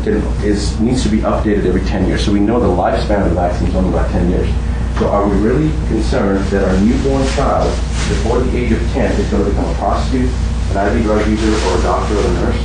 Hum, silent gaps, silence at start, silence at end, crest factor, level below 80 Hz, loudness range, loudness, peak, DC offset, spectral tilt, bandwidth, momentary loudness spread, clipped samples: none; none; 0 s; 0 s; 10 dB; -18 dBFS; 1 LU; -15 LUFS; -2 dBFS; under 0.1%; -6.5 dB/octave; 10 kHz; 3 LU; under 0.1%